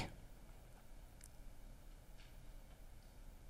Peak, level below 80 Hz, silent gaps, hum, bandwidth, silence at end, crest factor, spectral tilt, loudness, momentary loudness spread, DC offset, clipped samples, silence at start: -32 dBFS; -58 dBFS; none; none; 16 kHz; 0 s; 24 dB; -4.5 dB/octave; -61 LUFS; 2 LU; under 0.1%; under 0.1%; 0 s